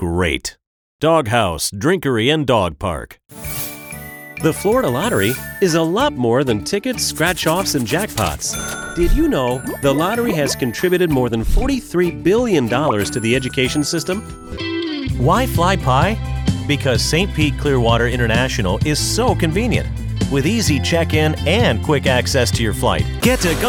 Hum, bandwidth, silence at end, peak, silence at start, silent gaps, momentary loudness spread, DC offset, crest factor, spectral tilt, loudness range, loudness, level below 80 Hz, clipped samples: none; over 20 kHz; 0 s; -2 dBFS; 0 s; 0.67-0.99 s; 8 LU; under 0.1%; 16 dB; -5 dB/octave; 2 LU; -17 LUFS; -28 dBFS; under 0.1%